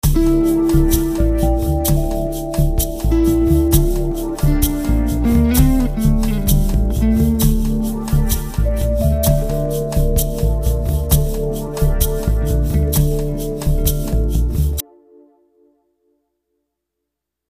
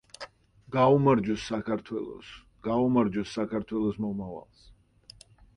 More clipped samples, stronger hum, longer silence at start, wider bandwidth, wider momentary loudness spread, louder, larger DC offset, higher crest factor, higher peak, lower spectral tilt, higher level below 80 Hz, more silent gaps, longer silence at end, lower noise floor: neither; neither; second, 0.05 s vs 0.2 s; first, 15.5 kHz vs 11 kHz; second, 6 LU vs 22 LU; first, -17 LUFS vs -28 LUFS; neither; about the same, 16 dB vs 20 dB; first, 0 dBFS vs -10 dBFS; about the same, -6.5 dB/octave vs -7.5 dB/octave; first, -18 dBFS vs -56 dBFS; neither; first, 2.7 s vs 1.15 s; first, -79 dBFS vs -55 dBFS